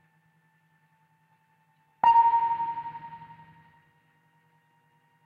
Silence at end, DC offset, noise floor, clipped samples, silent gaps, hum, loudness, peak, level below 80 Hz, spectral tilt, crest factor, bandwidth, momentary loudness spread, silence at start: 2 s; under 0.1%; -67 dBFS; under 0.1%; none; none; -23 LUFS; -10 dBFS; -72 dBFS; -5 dB/octave; 20 dB; 4.9 kHz; 25 LU; 2.05 s